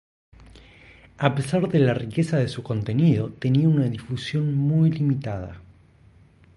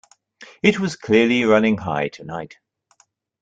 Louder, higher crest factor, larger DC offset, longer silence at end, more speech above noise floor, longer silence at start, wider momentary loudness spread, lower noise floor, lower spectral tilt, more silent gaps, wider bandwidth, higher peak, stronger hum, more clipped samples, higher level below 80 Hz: second, -23 LUFS vs -18 LUFS; about the same, 18 dB vs 18 dB; neither; about the same, 0.95 s vs 0.95 s; second, 32 dB vs 42 dB; first, 0.55 s vs 0.4 s; second, 8 LU vs 16 LU; second, -54 dBFS vs -61 dBFS; first, -8 dB/octave vs -5.5 dB/octave; neither; first, 11.5 kHz vs 8.8 kHz; about the same, -4 dBFS vs -2 dBFS; neither; neither; first, -52 dBFS vs -58 dBFS